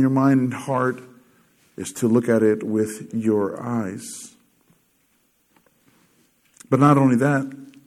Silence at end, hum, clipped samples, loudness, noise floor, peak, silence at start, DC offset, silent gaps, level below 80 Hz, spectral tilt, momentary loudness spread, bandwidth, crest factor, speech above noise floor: 0.2 s; none; under 0.1%; -20 LUFS; -65 dBFS; -2 dBFS; 0 s; under 0.1%; none; -70 dBFS; -7 dB/octave; 18 LU; 14.5 kHz; 20 dB; 45 dB